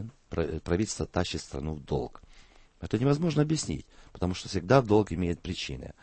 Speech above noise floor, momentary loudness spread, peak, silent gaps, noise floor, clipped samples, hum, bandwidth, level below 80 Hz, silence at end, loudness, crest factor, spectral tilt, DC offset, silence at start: 26 dB; 12 LU; -8 dBFS; none; -55 dBFS; under 0.1%; none; 8.8 kHz; -46 dBFS; 0.1 s; -29 LUFS; 22 dB; -6 dB/octave; under 0.1%; 0 s